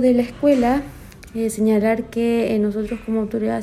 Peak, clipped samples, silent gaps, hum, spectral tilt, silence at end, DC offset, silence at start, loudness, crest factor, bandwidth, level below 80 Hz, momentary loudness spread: -6 dBFS; under 0.1%; none; none; -6.5 dB/octave; 0 s; under 0.1%; 0 s; -20 LUFS; 14 dB; 14 kHz; -44 dBFS; 8 LU